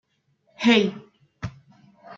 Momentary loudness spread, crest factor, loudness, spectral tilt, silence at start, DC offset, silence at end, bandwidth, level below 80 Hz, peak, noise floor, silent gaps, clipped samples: 19 LU; 20 dB; -21 LUFS; -5 dB/octave; 0.6 s; under 0.1%; 0.05 s; 7.6 kHz; -58 dBFS; -6 dBFS; -67 dBFS; none; under 0.1%